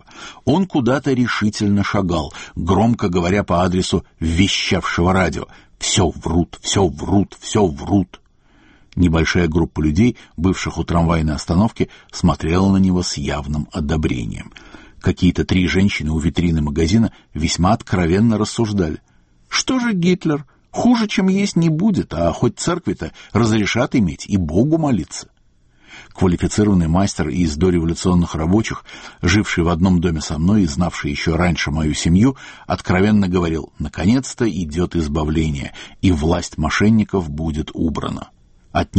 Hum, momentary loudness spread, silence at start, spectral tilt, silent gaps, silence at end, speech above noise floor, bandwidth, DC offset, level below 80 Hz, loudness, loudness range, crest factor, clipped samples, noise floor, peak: none; 8 LU; 0.15 s; -5.5 dB/octave; none; 0 s; 37 dB; 8.8 kHz; under 0.1%; -32 dBFS; -18 LUFS; 2 LU; 16 dB; under 0.1%; -54 dBFS; 0 dBFS